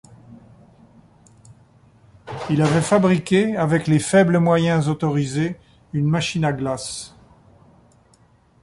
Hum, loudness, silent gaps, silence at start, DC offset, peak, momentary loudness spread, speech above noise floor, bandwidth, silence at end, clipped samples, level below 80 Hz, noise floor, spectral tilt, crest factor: none; -19 LUFS; none; 0.3 s; under 0.1%; -4 dBFS; 14 LU; 37 dB; 11.5 kHz; 1.55 s; under 0.1%; -52 dBFS; -56 dBFS; -6 dB/octave; 18 dB